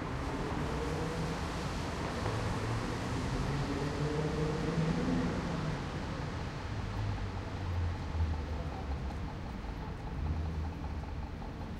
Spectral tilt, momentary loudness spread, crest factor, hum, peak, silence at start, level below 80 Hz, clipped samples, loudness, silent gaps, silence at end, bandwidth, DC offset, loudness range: -6.5 dB/octave; 8 LU; 14 dB; none; -20 dBFS; 0 s; -42 dBFS; under 0.1%; -37 LUFS; none; 0 s; 13 kHz; under 0.1%; 4 LU